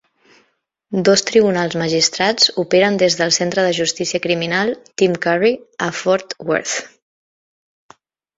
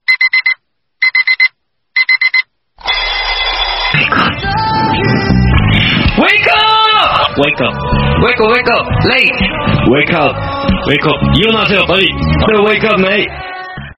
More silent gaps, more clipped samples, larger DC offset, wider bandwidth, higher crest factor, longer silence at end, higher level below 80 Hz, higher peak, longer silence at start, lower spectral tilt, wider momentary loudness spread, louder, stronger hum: neither; neither; neither; second, 8 kHz vs 11 kHz; about the same, 16 dB vs 12 dB; first, 1.5 s vs 0.05 s; second, -58 dBFS vs -24 dBFS; about the same, -2 dBFS vs 0 dBFS; first, 0.9 s vs 0.1 s; second, -3 dB/octave vs -7 dB/octave; about the same, 7 LU vs 6 LU; second, -16 LUFS vs -10 LUFS; neither